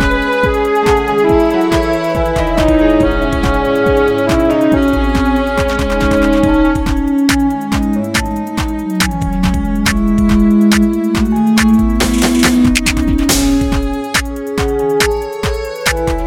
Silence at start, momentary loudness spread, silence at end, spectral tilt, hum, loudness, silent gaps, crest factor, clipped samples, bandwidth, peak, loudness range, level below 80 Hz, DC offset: 0 s; 6 LU; 0 s; -5 dB/octave; none; -13 LUFS; none; 12 dB; under 0.1%; 18.5 kHz; 0 dBFS; 3 LU; -20 dBFS; 0.4%